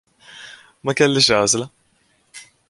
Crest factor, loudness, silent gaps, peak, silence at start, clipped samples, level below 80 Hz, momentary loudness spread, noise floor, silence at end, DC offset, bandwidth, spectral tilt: 20 dB; -17 LUFS; none; -2 dBFS; 0.35 s; under 0.1%; -56 dBFS; 24 LU; -62 dBFS; 0.3 s; under 0.1%; 11.5 kHz; -3 dB/octave